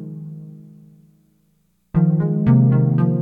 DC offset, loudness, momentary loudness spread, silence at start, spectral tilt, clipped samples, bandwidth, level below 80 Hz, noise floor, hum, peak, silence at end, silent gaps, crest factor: under 0.1%; -17 LUFS; 21 LU; 0 s; -12.5 dB/octave; under 0.1%; 2.8 kHz; -46 dBFS; -63 dBFS; 60 Hz at -50 dBFS; -4 dBFS; 0 s; none; 16 dB